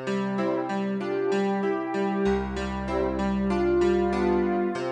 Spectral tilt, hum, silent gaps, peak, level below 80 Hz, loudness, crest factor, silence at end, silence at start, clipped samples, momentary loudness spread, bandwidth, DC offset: -7 dB/octave; none; none; -14 dBFS; -42 dBFS; -26 LUFS; 12 dB; 0 s; 0 s; under 0.1%; 5 LU; 9.4 kHz; under 0.1%